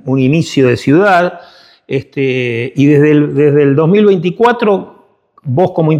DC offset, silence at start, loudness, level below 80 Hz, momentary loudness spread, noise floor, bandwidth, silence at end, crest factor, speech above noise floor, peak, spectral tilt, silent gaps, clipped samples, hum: under 0.1%; 0.05 s; -11 LUFS; -54 dBFS; 10 LU; -47 dBFS; 11 kHz; 0 s; 10 dB; 37 dB; 0 dBFS; -7.5 dB/octave; none; under 0.1%; none